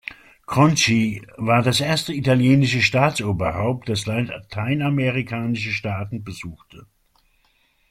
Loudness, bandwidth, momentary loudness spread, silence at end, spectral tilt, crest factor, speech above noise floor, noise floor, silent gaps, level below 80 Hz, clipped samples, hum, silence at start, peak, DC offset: -20 LUFS; 15 kHz; 12 LU; 1.1 s; -5 dB/octave; 20 dB; 42 dB; -63 dBFS; none; -52 dBFS; under 0.1%; none; 0.1 s; -2 dBFS; under 0.1%